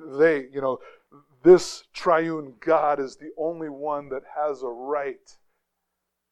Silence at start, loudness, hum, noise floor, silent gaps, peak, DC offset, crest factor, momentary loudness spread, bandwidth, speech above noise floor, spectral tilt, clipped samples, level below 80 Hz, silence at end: 0 s; -24 LUFS; none; -80 dBFS; none; -4 dBFS; under 0.1%; 20 dB; 16 LU; 10.5 kHz; 57 dB; -5.5 dB/octave; under 0.1%; -62 dBFS; 1.2 s